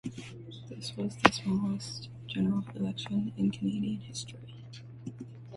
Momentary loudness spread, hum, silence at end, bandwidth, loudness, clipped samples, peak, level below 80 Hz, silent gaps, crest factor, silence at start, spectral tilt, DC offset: 20 LU; none; 0 s; 11.5 kHz; -32 LUFS; under 0.1%; -2 dBFS; -62 dBFS; none; 32 dB; 0.05 s; -5.5 dB/octave; under 0.1%